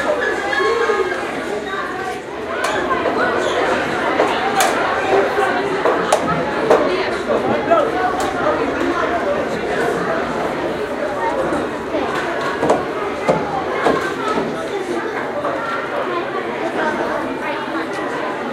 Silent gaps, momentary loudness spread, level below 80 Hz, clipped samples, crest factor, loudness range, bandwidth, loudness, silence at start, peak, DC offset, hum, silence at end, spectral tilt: none; 6 LU; -48 dBFS; under 0.1%; 18 dB; 4 LU; 16 kHz; -19 LUFS; 0 s; 0 dBFS; under 0.1%; none; 0 s; -4.5 dB/octave